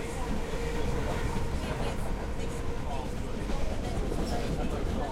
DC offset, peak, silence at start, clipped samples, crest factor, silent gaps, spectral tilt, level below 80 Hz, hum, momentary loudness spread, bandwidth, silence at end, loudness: under 0.1%; -18 dBFS; 0 s; under 0.1%; 12 dB; none; -6 dB/octave; -34 dBFS; none; 3 LU; 14.5 kHz; 0 s; -34 LUFS